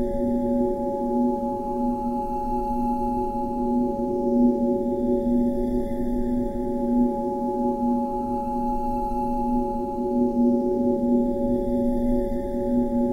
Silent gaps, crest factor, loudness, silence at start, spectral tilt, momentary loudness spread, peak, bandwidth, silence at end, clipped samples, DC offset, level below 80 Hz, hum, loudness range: none; 14 dB; -24 LUFS; 0 s; -9.5 dB/octave; 5 LU; -10 dBFS; 4.7 kHz; 0 s; under 0.1%; under 0.1%; -36 dBFS; none; 2 LU